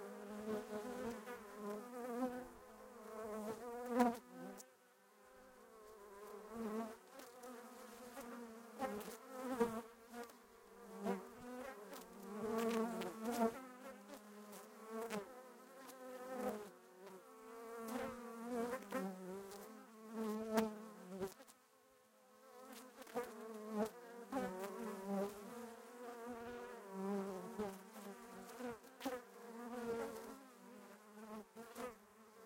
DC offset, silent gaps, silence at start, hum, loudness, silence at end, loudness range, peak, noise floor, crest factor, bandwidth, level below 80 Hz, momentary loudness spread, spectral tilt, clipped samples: under 0.1%; none; 0 s; none; -47 LUFS; 0 s; 6 LU; -20 dBFS; -71 dBFS; 28 dB; 16.5 kHz; -78 dBFS; 17 LU; -5 dB/octave; under 0.1%